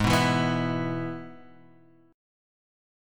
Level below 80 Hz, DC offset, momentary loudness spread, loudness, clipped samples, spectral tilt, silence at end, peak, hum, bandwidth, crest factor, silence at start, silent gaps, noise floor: -48 dBFS; under 0.1%; 17 LU; -26 LUFS; under 0.1%; -5.5 dB/octave; 0.95 s; -8 dBFS; none; 17.5 kHz; 20 dB; 0 s; none; -57 dBFS